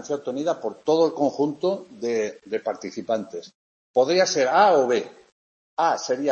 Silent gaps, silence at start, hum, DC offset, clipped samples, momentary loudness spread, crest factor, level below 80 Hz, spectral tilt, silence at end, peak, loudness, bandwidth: 3.55-3.94 s, 5.32-5.77 s; 0 s; none; under 0.1%; under 0.1%; 12 LU; 18 dB; -74 dBFS; -4 dB/octave; 0 s; -6 dBFS; -23 LUFS; 8 kHz